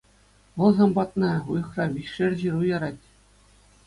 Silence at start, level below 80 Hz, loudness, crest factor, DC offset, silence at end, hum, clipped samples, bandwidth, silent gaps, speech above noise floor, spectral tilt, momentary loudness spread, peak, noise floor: 0.55 s; -56 dBFS; -24 LUFS; 20 dB; under 0.1%; 0.9 s; 50 Hz at -45 dBFS; under 0.1%; 11 kHz; none; 35 dB; -8 dB/octave; 10 LU; -6 dBFS; -58 dBFS